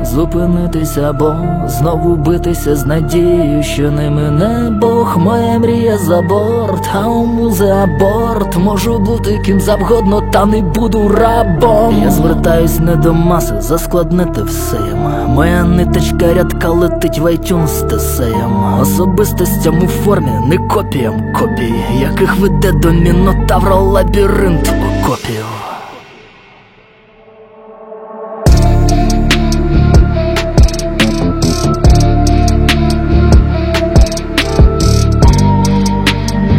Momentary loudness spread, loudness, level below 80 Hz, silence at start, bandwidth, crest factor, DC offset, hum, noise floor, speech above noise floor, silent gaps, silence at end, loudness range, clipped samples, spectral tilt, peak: 5 LU; -11 LUFS; -16 dBFS; 0 s; 17 kHz; 10 dB; under 0.1%; none; -43 dBFS; 32 dB; none; 0 s; 3 LU; under 0.1%; -6.5 dB/octave; 0 dBFS